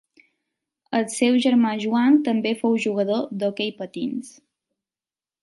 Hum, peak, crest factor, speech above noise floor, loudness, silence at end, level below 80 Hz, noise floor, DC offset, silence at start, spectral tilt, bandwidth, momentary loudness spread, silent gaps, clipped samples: none; -6 dBFS; 16 dB; over 69 dB; -22 LUFS; 1.1 s; -74 dBFS; under -90 dBFS; under 0.1%; 0.9 s; -5 dB/octave; 11.5 kHz; 11 LU; none; under 0.1%